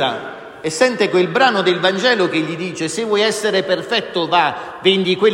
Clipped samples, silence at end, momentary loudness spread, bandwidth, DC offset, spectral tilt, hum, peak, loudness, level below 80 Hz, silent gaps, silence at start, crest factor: under 0.1%; 0 s; 9 LU; 15.5 kHz; under 0.1%; -4 dB/octave; none; 0 dBFS; -16 LUFS; -62 dBFS; none; 0 s; 16 dB